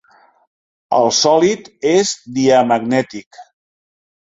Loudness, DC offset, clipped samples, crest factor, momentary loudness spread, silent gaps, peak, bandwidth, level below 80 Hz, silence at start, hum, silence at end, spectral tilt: -15 LUFS; under 0.1%; under 0.1%; 16 dB; 8 LU; 3.26-3.31 s; 0 dBFS; 8 kHz; -60 dBFS; 0.9 s; none; 0.8 s; -3.5 dB/octave